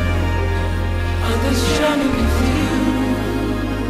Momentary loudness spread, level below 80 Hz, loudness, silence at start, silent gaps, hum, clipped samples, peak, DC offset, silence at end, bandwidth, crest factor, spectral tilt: 5 LU; -24 dBFS; -19 LUFS; 0 s; none; none; under 0.1%; -6 dBFS; under 0.1%; 0 s; 15 kHz; 12 dB; -6 dB/octave